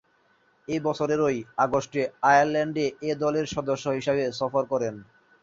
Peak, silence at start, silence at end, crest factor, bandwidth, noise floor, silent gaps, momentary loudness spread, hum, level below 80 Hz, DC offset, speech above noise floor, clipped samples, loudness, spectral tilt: -6 dBFS; 0.7 s; 0.4 s; 20 dB; 7.8 kHz; -65 dBFS; none; 9 LU; none; -62 dBFS; under 0.1%; 40 dB; under 0.1%; -25 LUFS; -5.5 dB/octave